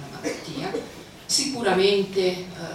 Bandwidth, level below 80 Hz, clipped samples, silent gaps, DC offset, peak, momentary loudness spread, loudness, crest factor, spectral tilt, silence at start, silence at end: 15.5 kHz; -58 dBFS; under 0.1%; none; under 0.1%; -8 dBFS; 13 LU; -24 LUFS; 18 dB; -3 dB/octave; 0 s; 0 s